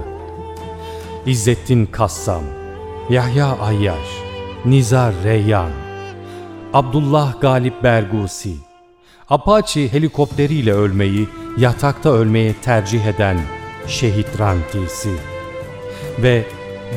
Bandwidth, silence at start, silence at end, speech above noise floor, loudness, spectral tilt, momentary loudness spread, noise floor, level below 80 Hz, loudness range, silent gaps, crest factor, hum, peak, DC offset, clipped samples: 15.5 kHz; 0 s; 0 s; 32 dB; -17 LUFS; -6.5 dB/octave; 15 LU; -48 dBFS; -36 dBFS; 4 LU; none; 16 dB; none; 0 dBFS; under 0.1%; under 0.1%